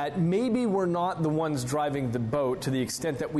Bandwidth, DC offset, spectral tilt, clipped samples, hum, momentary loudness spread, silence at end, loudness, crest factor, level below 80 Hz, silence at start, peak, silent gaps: 12.5 kHz; under 0.1%; -6 dB/octave; under 0.1%; none; 3 LU; 0 s; -28 LUFS; 10 dB; -56 dBFS; 0 s; -16 dBFS; none